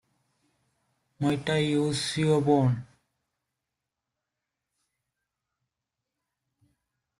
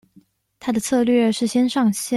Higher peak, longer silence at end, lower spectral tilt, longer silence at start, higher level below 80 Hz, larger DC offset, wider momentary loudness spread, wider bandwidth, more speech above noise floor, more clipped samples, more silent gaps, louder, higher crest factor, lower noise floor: second, -10 dBFS vs -6 dBFS; first, 4.35 s vs 0 s; first, -6 dB/octave vs -4.5 dB/octave; first, 1.2 s vs 0.65 s; second, -66 dBFS vs -60 dBFS; neither; about the same, 7 LU vs 7 LU; about the same, 12.5 kHz vs 13.5 kHz; first, 62 dB vs 37 dB; neither; neither; second, -26 LUFS vs -19 LUFS; first, 20 dB vs 14 dB; first, -86 dBFS vs -55 dBFS